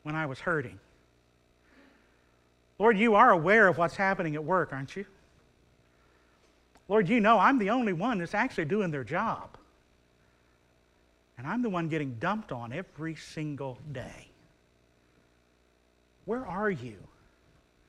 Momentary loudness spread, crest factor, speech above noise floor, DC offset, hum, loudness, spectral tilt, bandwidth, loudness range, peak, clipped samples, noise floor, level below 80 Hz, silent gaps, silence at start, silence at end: 20 LU; 22 dB; 39 dB; under 0.1%; 60 Hz at -60 dBFS; -28 LUFS; -6.5 dB/octave; 11.5 kHz; 14 LU; -8 dBFS; under 0.1%; -67 dBFS; -62 dBFS; none; 0.05 s; 0.9 s